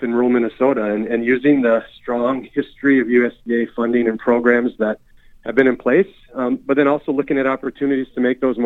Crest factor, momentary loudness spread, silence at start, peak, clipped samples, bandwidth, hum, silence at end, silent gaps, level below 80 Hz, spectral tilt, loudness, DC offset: 18 dB; 8 LU; 0 s; 0 dBFS; under 0.1%; 4.1 kHz; none; 0 s; none; -52 dBFS; -8.5 dB/octave; -18 LUFS; under 0.1%